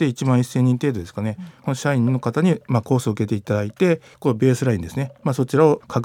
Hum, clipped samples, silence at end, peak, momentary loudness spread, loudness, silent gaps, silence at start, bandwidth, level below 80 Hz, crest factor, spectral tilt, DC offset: none; under 0.1%; 0 s; -2 dBFS; 10 LU; -21 LUFS; none; 0 s; 15.5 kHz; -58 dBFS; 18 dB; -7.5 dB/octave; under 0.1%